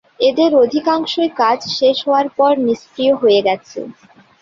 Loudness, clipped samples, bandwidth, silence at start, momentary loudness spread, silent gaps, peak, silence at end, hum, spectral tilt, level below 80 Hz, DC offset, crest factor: -15 LUFS; under 0.1%; 7.4 kHz; 0.2 s; 8 LU; none; -2 dBFS; 0.5 s; none; -4.5 dB/octave; -60 dBFS; under 0.1%; 14 dB